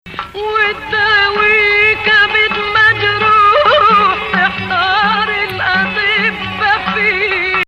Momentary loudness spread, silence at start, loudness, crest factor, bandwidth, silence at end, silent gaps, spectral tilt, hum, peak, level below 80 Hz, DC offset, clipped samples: 6 LU; 0.05 s; -11 LUFS; 12 dB; 14.5 kHz; 0.05 s; none; -4.5 dB/octave; none; 0 dBFS; -40 dBFS; under 0.1%; under 0.1%